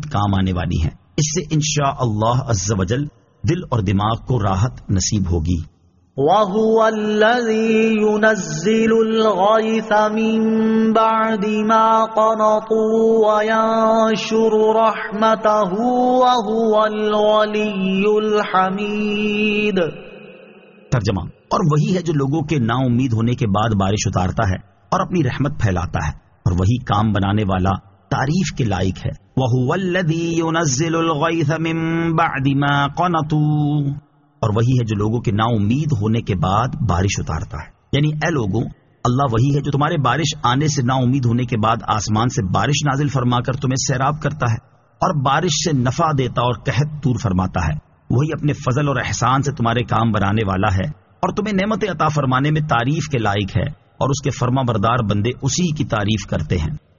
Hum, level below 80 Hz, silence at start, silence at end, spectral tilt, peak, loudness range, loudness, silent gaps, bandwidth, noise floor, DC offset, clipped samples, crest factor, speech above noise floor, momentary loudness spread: none; -38 dBFS; 0 s; 0.2 s; -5.5 dB/octave; -2 dBFS; 4 LU; -18 LUFS; none; 7.4 kHz; -44 dBFS; under 0.1%; under 0.1%; 16 dB; 27 dB; 7 LU